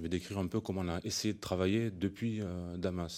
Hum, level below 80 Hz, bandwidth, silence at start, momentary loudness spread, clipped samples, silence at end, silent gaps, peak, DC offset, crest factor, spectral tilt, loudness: none; -62 dBFS; 16.5 kHz; 0 s; 5 LU; under 0.1%; 0 s; none; -18 dBFS; under 0.1%; 16 dB; -5.5 dB/octave; -36 LUFS